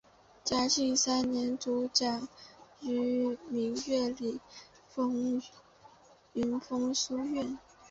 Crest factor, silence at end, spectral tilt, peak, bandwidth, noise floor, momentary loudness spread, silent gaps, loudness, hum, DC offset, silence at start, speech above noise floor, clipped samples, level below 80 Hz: 20 dB; 0.05 s; -2.5 dB/octave; -14 dBFS; 8 kHz; -59 dBFS; 16 LU; none; -32 LUFS; none; under 0.1%; 0.45 s; 27 dB; under 0.1%; -66 dBFS